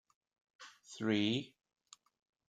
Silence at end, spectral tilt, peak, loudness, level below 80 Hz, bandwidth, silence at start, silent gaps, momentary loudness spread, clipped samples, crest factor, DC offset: 1.05 s; -5 dB/octave; -20 dBFS; -36 LUFS; -82 dBFS; 9.2 kHz; 0.6 s; none; 23 LU; under 0.1%; 22 dB; under 0.1%